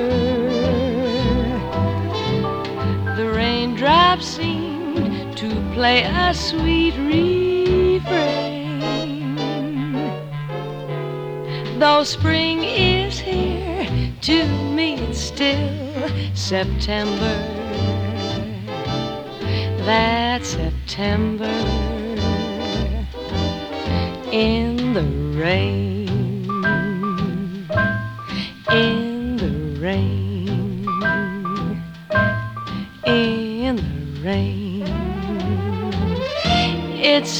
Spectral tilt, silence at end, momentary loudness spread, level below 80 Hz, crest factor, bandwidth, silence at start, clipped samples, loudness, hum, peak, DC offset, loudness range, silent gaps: -5.5 dB/octave; 0 s; 9 LU; -34 dBFS; 20 dB; 13.5 kHz; 0 s; under 0.1%; -21 LUFS; none; 0 dBFS; under 0.1%; 4 LU; none